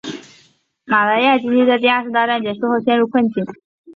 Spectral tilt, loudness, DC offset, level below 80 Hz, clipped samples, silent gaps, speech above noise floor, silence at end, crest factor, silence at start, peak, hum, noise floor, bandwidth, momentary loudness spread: -5.5 dB/octave; -16 LUFS; under 0.1%; -64 dBFS; under 0.1%; 3.64-3.84 s; 40 dB; 0.05 s; 16 dB; 0.05 s; -2 dBFS; none; -55 dBFS; 7.2 kHz; 12 LU